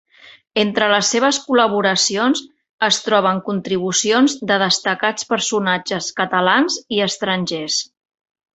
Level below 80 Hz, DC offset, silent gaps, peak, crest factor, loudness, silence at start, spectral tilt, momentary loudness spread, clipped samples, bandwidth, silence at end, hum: -62 dBFS; under 0.1%; 2.69-2.78 s; -2 dBFS; 18 dB; -17 LUFS; 0.25 s; -2.5 dB/octave; 6 LU; under 0.1%; 8.2 kHz; 0.7 s; none